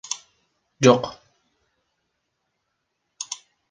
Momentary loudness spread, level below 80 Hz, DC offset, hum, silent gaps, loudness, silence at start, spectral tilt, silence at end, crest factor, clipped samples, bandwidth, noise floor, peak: 19 LU; -64 dBFS; under 0.1%; none; none; -21 LUFS; 0.1 s; -4.5 dB/octave; 0.35 s; 24 dB; under 0.1%; 10 kHz; -77 dBFS; -2 dBFS